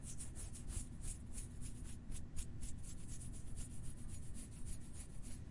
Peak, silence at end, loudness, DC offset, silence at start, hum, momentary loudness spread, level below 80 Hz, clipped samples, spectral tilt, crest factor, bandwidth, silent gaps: -30 dBFS; 0 s; -51 LUFS; under 0.1%; 0 s; none; 4 LU; -50 dBFS; under 0.1%; -4.5 dB/octave; 16 dB; 11.5 kHz; none